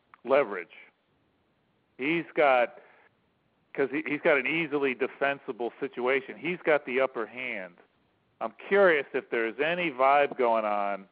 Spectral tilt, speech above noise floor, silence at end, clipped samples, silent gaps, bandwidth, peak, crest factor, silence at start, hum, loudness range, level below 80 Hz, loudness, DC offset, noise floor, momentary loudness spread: -2.5 dB/octave; 43 dB; 0.1 s; under 0.1%; none; 5 kHz; -10 dBFS; 18 dB; 0.25 s; none; 4 LU; -82 dBFS; -27 LUFS; under 0.1%; -71 dBFS; 12 LU